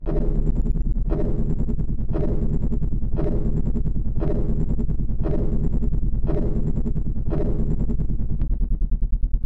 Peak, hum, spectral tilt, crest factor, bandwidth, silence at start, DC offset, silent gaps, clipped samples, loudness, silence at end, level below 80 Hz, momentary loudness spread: -8 dBFS; none; -11.5 dB/octave; 10 dB; 2.1 kHz; 0 s; 2%; none; under 0.1%; -26 LUFS; 0 s; -22 dBFS; 2 LU